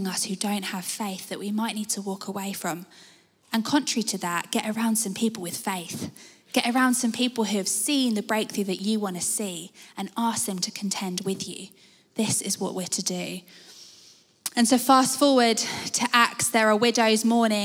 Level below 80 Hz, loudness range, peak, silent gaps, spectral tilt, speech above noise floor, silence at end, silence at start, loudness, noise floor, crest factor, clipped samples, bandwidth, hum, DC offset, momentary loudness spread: -76 dBFS; 8 LU; -4 dBFS; none; -3 dB/octave; 29 dB; 0 s; 0 s; -25 LUFS; -55 dBFS; 22 dB; under 0.1%; 20 kHz; none; under 0.1%; 14 LU